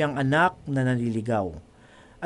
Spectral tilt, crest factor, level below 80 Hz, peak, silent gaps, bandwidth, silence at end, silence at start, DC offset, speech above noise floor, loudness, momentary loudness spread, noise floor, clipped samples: -7 dB/octave; 18 dB; -54 dBFS; -8 dBFS; none; 11.5 kHz; 0 s; 0 s; under 0.1%; 28 dB; -25 LUFS; 10 LU; -52 dBFS; under 0.1%